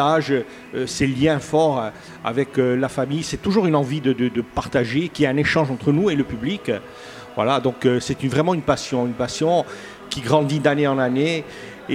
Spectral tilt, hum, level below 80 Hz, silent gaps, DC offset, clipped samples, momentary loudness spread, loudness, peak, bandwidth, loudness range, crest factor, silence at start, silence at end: -6 dB/octave; none; -50 dBFS; none; under 0.1%; under 0.1%; 10 LU; -21 LUFS; 0 dBFS; 15 kHz; 1 LU; 20 dB; 0 s; 0 s